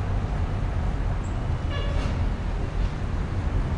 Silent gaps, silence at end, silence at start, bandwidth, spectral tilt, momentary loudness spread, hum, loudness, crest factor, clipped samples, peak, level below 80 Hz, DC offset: none; 0 s; 0 s; 9.2 kHz; -7.5 dB/octave; 2 LU; none; -29 LUFS; 12 dB; under 0.1%; -14 dBFS; -28 dBFS; under 0.1%